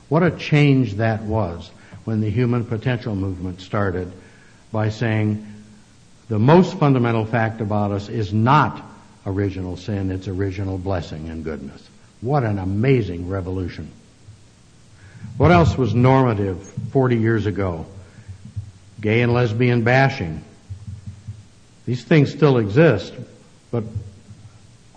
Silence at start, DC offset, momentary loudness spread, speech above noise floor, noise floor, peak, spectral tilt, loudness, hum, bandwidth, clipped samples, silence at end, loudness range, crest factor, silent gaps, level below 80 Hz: 0.1 s; under 0.1%; 21 LU; 30 dB; -49 dBFS; -2 dBFS; -8 dB/octave; -20 LUFS; none; 8.8 kHz; under 0.1%; 0.5 s; 6 LU; 18 dB; none; -46 dBFS